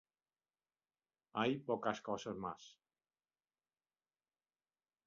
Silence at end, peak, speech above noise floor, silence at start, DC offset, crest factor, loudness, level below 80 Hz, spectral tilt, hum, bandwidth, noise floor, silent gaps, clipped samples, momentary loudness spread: 2.35 s; -22 dBFS; over 49 dB; 1.35 s; under 0.1%; 24 dB; -41 LUFS; -80 dBFS; -4 dB/octave; none; 7.2 kHz; under -90 dBFS; none; under 0.1%; 12 LU